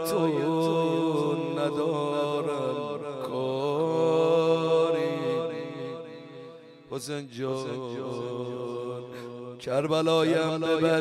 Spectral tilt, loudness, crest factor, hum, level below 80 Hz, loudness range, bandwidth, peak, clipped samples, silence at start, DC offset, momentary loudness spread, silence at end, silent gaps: -6 dB/octave; -27 LUFS; 16 dB; none; -72 dBFS; 9 LU; 14.5 kHz; -12 dBFS; under 0.1%; 0 s; under 0.1%; 15 LU; 0 s; none